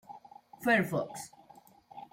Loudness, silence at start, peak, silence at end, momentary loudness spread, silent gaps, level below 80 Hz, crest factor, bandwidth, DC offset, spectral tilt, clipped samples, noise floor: -31 LUFS; 0.1 s; -14 dBFS; 0.1 s; 24 LU; none; -72 dBFS; 20 dB; 16.5 kHz; under 0.1%; -5 dB/octave; under 0.1%; -59 dBFS